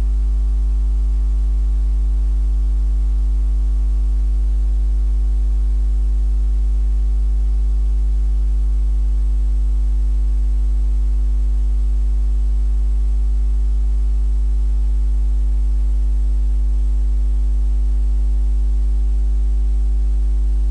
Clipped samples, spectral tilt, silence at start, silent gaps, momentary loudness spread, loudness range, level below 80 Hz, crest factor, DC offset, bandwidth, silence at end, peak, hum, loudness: under 0.1%; -8.5 dB/octave; 0 s; none; 0 LU; 0 LU; -16 dBFS; 4 dB; under 0.1%; 1.3 kHz; 0 s; -12 dBFS; 50 Hz at -15 dBFS; -20 LUFS